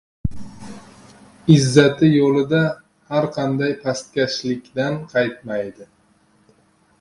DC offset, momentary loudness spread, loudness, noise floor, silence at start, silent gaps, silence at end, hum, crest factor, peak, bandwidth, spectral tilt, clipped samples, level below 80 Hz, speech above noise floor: under 0.1%; 18 LU; -19 LUFS; -58 dBFS; 0.25 s; none; 1.15 s; none; 20 dB; 0 dBFS; 11.5 kHz; -6 dB/octave; under 0.1%; -46 dBFS; 40 dB